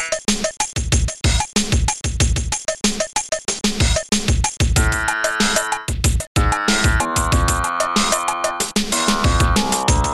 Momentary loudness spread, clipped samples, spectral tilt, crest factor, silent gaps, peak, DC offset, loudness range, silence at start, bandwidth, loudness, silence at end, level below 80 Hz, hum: 4 LU; under 0.1%; -3.5 dB/octave; 14 dB; 6.27-6.35 s; -4 dBFS; under 0.1%; 2 LU; 0 s; 14.5 kHz; -18 LUFS; 0 s; -24 dBFS; none